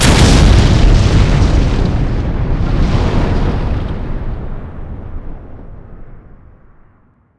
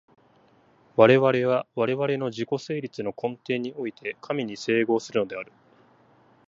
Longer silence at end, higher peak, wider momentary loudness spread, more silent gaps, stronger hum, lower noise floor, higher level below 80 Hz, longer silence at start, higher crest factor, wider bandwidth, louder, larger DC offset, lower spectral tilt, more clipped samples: first, 1.2 s vs 1.05 s; about the same, 0 dBFS vs -2 dBFS; first, 21 LU vs 14 LU; neither; neither; second, -50 dBFS vs -59 dBFS; first, -14 dBFS vs -72 dBFS; second, 0 s vs 0.95 s; second, 12 dB vs 22 dB; first, 11 kHz vs 7.8 kHz; first, -13 LUFS vs -25 LUFS; neither; about the same, -5.5 dB/octave vs -6.5 dB/octave; first, 0.3% vs under 0.1%